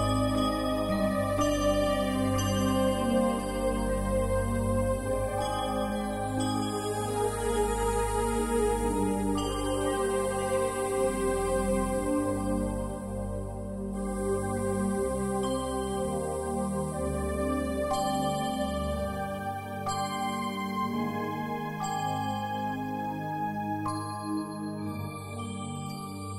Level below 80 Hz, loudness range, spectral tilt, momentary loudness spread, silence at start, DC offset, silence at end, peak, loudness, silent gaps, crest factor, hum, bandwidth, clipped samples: -40 dBFS; 5 LU; -5.5 dB/octave; 8 LU; 0 s; under 0.1%; 0 s; -14 dBFS; -30 LUFS; none; 16 dB; none; 16 kHz; under 0.1%